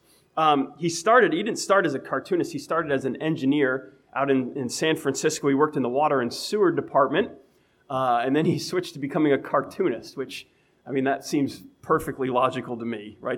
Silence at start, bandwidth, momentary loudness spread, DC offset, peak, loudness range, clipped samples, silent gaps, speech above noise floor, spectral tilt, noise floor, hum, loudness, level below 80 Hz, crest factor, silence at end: 0.35 s; 16 kHz; 10 LU; under 0.1%; -4 dBFS; 4 LU; under 0.1%; none; 36 dB; -5 dB/octave; -60 dBFS; none; -24 LUFS; -64 dBFS; 20 dB; 0 s